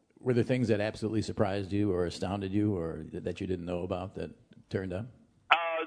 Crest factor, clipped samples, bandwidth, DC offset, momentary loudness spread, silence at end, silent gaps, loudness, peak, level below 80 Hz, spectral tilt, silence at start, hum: 26 dB; under 0.1%; 10.5 kHz; under 0.1%; 10 LU; 0 s; none; -32 LUFS; -6 dBFS; -58 dBFS; -6.5 dB/octave; 0.25 s; none